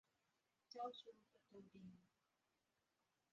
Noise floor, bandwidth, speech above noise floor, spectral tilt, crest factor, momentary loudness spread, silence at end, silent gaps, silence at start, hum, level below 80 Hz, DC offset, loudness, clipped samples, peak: -89 dBFS; 7.2 kHz; 30 dB; -4 dB/octave; 22 dB; 14 LU; 1.25 s; none; 0.7 s; none; under -90 dBFS; under 0.1%; -58 LUFS; under 0.1%; -38 dBFS